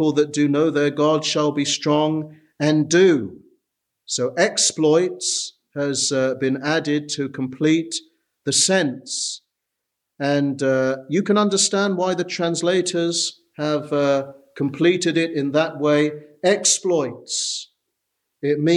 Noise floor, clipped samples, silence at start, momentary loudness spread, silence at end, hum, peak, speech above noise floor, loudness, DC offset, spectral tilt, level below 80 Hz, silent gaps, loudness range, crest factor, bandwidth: -80 dBFS; under 0.1%; 0 s; 10 LU; 0 s; none; -2 dBFS; 60 dB; -20 LUFS; under 0.1%; -3.5 dB/octave; -70 dBFS; none; 2 LU; 18 dB; 12.5 kHz